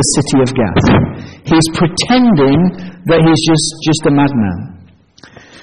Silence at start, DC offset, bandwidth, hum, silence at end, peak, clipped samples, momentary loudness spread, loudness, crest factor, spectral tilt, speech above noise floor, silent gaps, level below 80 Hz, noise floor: 0 s; under 0.1%; 10.5 kHz; none; 0.85 s; -2 dBFS; under 0.1%; 10 LU; -11 LUFS; 10 dB; -5 dB/octave; 31 dB; none; -34 dBFS; -42 dBFS